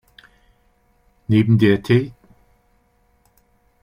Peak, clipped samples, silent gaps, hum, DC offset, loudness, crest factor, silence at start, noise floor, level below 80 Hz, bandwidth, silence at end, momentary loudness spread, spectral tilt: -2 dBFS; under 0.1%; none; none; under 0.1%; -17 LUFS; 18 dB; 1.3 s; -61 dBFS; -52 dBFS; 10.5 kHz; 1.75 s; 17 LU; -8.5 dB/octave